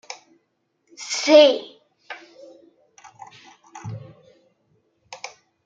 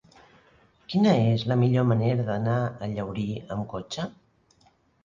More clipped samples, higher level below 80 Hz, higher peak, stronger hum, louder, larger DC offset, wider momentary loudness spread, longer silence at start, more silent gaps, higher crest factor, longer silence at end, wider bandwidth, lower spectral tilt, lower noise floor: neither; second, -74 dBFS vs -56 dBFS; first, -2 dBFS vs -8 dBFS; neither; first, -16 LUFS vs -26 LUFS; neither; first, 27 LU vs 12 LU; second, 0.1 s vs 0.9 s; neither; about the same, 22 dB vs 18 dB; second, 0.4 s vs 0.95 s; about the same, 7.8 kHz vs 7.4 kHz; second, -3.5 dB/octave vs -8 dB/octave; first, -71 dBFS vs -63 dBFS